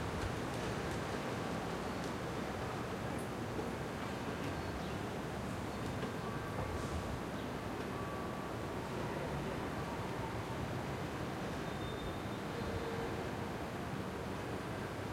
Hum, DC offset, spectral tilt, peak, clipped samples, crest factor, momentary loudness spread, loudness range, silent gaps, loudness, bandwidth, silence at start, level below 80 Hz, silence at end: none; under 0.1%; -5.5 dB/octave; -26 dBFS; under 0.1%; 14 dB; 2 LU; 1 LU; none; -41 LUFS; 16 kHz; 0 s; -54 dBFS; 0 s